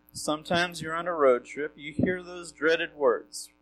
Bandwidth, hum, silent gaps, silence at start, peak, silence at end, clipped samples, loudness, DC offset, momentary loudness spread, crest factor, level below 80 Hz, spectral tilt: 13 kHz; none; none; 0.15 s; -10 dBFS; 0.15 s; under 0.1%; -28 LUFS; under 0.1%; 11 LU; 18 dB; -60 dBFS; -4.5 dB/octave